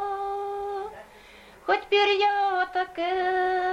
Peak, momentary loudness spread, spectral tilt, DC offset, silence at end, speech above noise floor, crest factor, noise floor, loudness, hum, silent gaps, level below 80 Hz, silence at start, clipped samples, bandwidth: -10 dBFS; 14 LU; -3 dB/octave; under 0.1%; 0 s; 26 dB; 16 dB; -50 dBFS; -25 LUFS; none; none; -60 dBFS; 0 s; under 0.1%; 11 kHz